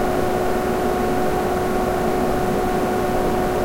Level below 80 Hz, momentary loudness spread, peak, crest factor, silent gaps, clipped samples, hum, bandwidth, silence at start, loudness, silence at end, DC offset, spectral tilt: -32 dBFS; 1 LU; -8 dBFS; 12 dB; none; under 0.1%; none; 16 kHz; 0 s; -21 LUFS; 0 s; under 0.1%; -6 dB/octave